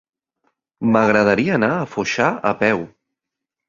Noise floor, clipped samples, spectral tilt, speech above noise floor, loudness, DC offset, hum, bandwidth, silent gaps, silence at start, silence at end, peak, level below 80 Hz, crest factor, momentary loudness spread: -83 dBFS; under 0.1%; -6 dB/octave; 66 dB; -18 LUFS; under 0.1%; none; 7.4 kHz; none; 0.8 s; 0.8 s; -2 dBFS; -56 dBFS; 18 dB; 9 LU